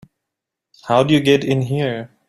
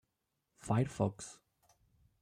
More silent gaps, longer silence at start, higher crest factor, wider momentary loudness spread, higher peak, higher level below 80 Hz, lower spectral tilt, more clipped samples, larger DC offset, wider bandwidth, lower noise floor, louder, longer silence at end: neither; first, 0.85 s vs 0.65 s; about the same, 18 dB vs 20 dB; second, 9 LU vs 17 LU; first, -2 dBFS vs -18 dBFS; first, -54 dBFS vs -66 dBFS; about the same, -6.5 dB/octave vs -7 dB/octave; neither; neither; first, 13 kHz vs 11 kHz; about the same, -82 dBFS vs -85 dBFS; first, -17 LUFS vs -36 LUFS; second, 0.25 s vs 0.9 s